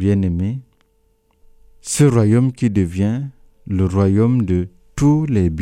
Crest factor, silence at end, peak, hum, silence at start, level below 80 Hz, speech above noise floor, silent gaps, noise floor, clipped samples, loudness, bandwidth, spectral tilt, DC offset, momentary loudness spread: 16 dB; 0 s; -2 dBFS; none; 0 s; -40 dBFS; 44 dB; none; -60 dBFS; under 0.1%; -17 LUFS; 13.5 kHz; -7.5 dB/octave; under 0.1%; 11 LU